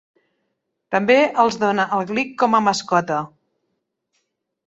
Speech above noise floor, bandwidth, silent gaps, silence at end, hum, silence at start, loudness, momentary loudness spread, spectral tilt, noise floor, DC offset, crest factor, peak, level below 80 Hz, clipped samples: 56 dB; 8 kHz; none; 1.4 s; none; 0.9 s; -18 LUFS; 9 LU; -4.5 dB/octave; -75 dBFS; under 0.1%; 18 dB; -2 dBFS; -64 dBFS; under 0.1%